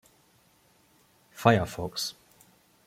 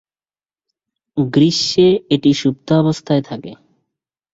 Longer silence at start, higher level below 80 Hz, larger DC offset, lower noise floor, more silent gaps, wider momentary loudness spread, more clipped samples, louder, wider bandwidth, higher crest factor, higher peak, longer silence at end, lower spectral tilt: first, 1.35 s vs 1.15 s; second, -60 dBFS vs -54 dBFS; neither; second, -64 dBFS vs under -90 dBFS; neither; second, 10 LU vs 14 LU; neither; second, -27 LUFS vs -15 LUFS; first, 16.5 kHz vs 8 kHz; first, 26 dB vs 16 dB; about the same, -4 dBFS vs -2 dBFS; about the same, 0.75 s vs 0.8 s; about the same, -5 dB/octave vs -6 dB/octave